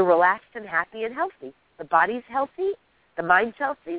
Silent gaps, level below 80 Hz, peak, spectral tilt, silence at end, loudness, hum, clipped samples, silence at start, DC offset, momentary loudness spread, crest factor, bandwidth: none; -66 dBFS; -4 dBFS; -8.5 dB/octave; 0 s; -24 LUFS; none; under 0.1%; 0 s; under 0.1%; 18 LU; 20 dB; 4 kHz